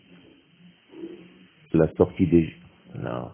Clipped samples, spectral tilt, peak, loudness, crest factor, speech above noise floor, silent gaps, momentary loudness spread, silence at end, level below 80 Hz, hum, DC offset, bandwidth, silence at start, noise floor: under 0.1%; -12.5 dB/octave; -4 dBFS; -24 LUFS; 22 dB; 33 dB; none; 21 LU; 0 s; -46 dBFS; none; under 0.1%; 3.6 kHz; 0.95 s; -55 dBFS